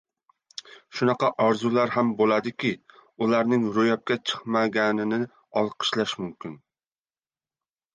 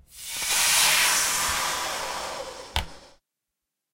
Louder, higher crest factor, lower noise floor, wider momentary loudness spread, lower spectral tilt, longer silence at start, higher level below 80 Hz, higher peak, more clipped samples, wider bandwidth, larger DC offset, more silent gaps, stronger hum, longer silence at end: about the same, -24 LUFS vs -22 LUFS; about the same, 18 dB vs 22 dB; first, under -90 dBFS vs -85 dBFS; about the same, 16 LU vs 16 LU; first, -5.5 dB/octave vs 0.5 dB/octave; first, 0.65 s vs 0.15 s; second, -70 dBFS vs -46 dBFS; second, -8 dBFS vs -4 dBFS; neither; second, 9.2 kHz vs 16 kHz; neither; neither; neither; first, 1.4 s vs 0.85 s